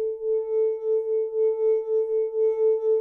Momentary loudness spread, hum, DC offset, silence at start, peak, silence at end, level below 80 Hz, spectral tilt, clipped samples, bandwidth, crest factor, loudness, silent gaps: 4 LU; none; under 0.1%; 0 s; -16 dBFS; 0 s; -68 dBFS; -6.5 dB/octave; under 0.1%; 2.3 kHz; 8 dB; -24 LUFS; none